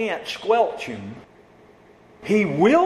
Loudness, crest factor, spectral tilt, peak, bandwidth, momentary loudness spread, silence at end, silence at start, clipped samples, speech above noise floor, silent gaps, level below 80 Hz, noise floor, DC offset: -22 LUFS; 18 dB; -6 dB/octave; -4 dBFS; 13.5 kHz; 21 LU; 0 s; 0 s; under 0.1%; 30 dB; none; -60 dBFS; -51 dBFS; under 0.1%